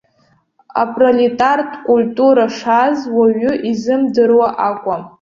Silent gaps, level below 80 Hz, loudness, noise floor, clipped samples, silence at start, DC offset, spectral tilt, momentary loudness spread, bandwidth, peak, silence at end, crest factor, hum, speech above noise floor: none; -56 dBFS; -14 LUFS; -57 dBFS; under 0.1%; 0.75 s; under 0.1%; -6 dB/octave; 7 LU; 7.4 kHz; -2 dBFS; 0.15 s; 12 dB; none; 43 dB